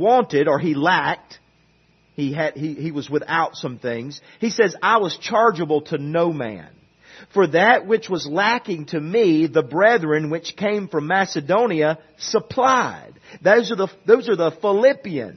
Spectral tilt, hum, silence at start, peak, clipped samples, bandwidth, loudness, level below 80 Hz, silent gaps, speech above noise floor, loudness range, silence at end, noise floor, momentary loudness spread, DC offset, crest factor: -5.5 dB/octave; none; 0 s; -2 dBFS; under 0.1%; 6.4 kHz; -19 LUFS; -66 dBFS; none; 39 dB; 5 LU; 0 s; -58 dBFS; 11 LU; under 0.1%; 18 dB